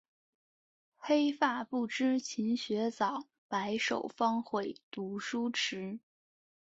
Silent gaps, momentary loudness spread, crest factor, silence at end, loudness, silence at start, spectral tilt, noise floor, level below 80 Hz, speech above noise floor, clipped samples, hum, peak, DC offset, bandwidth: 3.38-3.49 s, 4.83-4.91 s; 11 LU; 20 dB; 0.7 s; -34 LUFS; 1 s; -4 dB/octave; under -90 dBFS; -80 dBFS; over 57 dB; under 0.1%; none; -16 dBFS; under 0.1%; 8 kHz